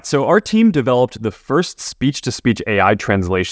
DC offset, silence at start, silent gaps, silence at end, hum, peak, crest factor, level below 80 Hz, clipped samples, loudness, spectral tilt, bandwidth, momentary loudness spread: under 0.1%; 0.05 s; none; 0 s; none; 0 dBFS; 16 dB; -40 dBFS; under 0.1%; -16 LUFS; -5.5 dB/octave; 8 kHz; 6 LU